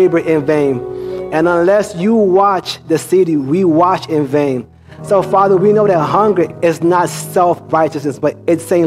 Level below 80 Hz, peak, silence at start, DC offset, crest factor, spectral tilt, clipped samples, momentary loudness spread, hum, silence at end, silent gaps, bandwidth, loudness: -52 dBFS; 0 dBFS; 0 s; under 0.1%; 12 dB; -6.5 dB/octave; under 0.1%; 7 LU; none; 0 s; none; 15 kHz; -13 LUFS